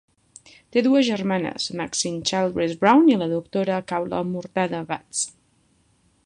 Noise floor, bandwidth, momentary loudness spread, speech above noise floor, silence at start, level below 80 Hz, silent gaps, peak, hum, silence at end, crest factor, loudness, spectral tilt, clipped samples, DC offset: -63 dBFS; 11 kHz; 10 LU; 41 dB; 0.75 s; -60 dBFS; none; -2 dBFS; none; 0.95 s; 20 dB; -22 LUFS; -4.5 dB/octave; under 0.1%; under 0.1%